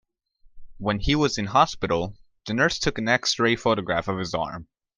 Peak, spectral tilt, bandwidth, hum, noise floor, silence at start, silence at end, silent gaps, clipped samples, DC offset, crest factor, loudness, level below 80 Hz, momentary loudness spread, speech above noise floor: -4 dBFS; -4.5 dB/octave; 10.5 kHz; none; -57 dBFS; 0.55 s; 0.35 s; none; under 0.1%; under 0.1%; 22 dB; -24 LUFS; -42 dBFS; 10 LU; 34 dB